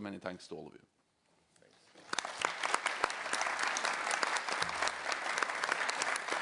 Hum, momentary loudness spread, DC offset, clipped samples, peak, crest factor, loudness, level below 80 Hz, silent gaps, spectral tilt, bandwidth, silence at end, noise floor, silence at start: none; 11 LU; under 0.1%; under 0.1%; -12 dBFS; 26 dB; -35 LUFS; -76 dBFS; none; -0.5 dB/octave; 11 kHz; 0 s; -74 dBFS; 0 s